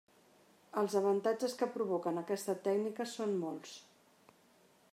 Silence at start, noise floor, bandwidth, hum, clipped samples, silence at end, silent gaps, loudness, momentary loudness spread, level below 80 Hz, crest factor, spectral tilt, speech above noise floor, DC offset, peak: 0.75 s; -67 dBFS; 16 kHz; none; under 0.1%; 1.1 s; none; -36 LUFS; 10 LU; under -90 dBFS; 18 dB; -5 dB/octave; 32 dB; under 0.1%; -20 dBFS